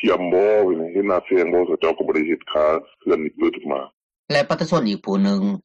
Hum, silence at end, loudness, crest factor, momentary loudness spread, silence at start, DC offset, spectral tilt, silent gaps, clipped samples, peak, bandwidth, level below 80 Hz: none; 0.05 s; -20 LUFS; 12 dB; 6 LU; 0 s; under 0.1%; -6.5 dB/octave; 3.93-4.10 s, 4.19-4.28 s; under 0.1%; -8 dBFS; 9.4 kHz; -58 dBFS